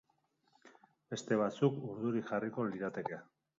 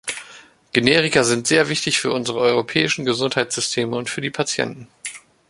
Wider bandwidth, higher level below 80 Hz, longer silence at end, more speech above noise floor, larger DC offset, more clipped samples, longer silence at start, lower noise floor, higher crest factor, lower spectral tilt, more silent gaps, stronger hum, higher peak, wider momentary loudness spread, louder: second, 7.4 kHz vs 11.5 kHz; second, -80 dBFS vs -58 dBFS; about the same, 0.35 s vs 0.3 s; first, 41 dB vs 26 dB; neither; neither; first, 0.65 s vs 0.05 s; first, -77 dBFS vs -46 dBFS; about the same, 22 dB vs 20 dB; first, -6.5 dB/octave vs -3 dB/octave; neither; neither; second, -16 dBFS vs 0 dBFS; about the same, 12 LU vs 14 LU; second, -37 LUFS vs -19 LUFS